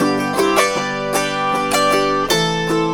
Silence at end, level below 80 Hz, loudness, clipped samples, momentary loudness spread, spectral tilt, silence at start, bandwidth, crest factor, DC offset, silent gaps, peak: 0 s; -42 dBFS; -17 LUFS; under 0.1%; 4 LU; -3.5 dB/octave; 0 s; 19 kHz; 16 dB; under 0.1%; none; 0 dBFS